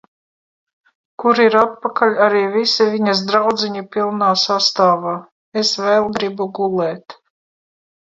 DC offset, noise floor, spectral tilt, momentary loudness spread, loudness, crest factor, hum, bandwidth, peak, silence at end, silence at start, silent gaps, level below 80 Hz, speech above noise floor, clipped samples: under 0.1%; under -90 dBFS; -4 dB/octave; 8 LU; -16 LUFS; 18 dB; none; 7.8 kHz; 0 dBFS; 1.05 s; 1.2 s; 5.32-5.52 s; -64 dBFS; over 74 dB; under 0.1%